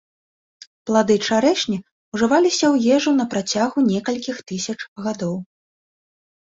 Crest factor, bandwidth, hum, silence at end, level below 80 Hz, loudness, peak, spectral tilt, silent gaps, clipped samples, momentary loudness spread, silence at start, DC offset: 16 dB; 8 kHz; none; 1.05 s; -60 dBFS; -20 LUFS; -4 dBFS; -4.5 dB/octave; 1.91-2.12 s, 4.88-4.96 s; under 0.1%; 11 LU; 0.85 s; under 0.1%